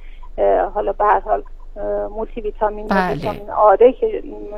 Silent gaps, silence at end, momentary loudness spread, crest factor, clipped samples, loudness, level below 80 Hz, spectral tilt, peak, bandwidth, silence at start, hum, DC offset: none; 0 s; 13 LU; 18 dB; under 0.1%; -18 LUFS; -32 dBFS; -7.5 dB/octave; 0 dBFS; 6.2 kHz; 0 s; none; under 0.1%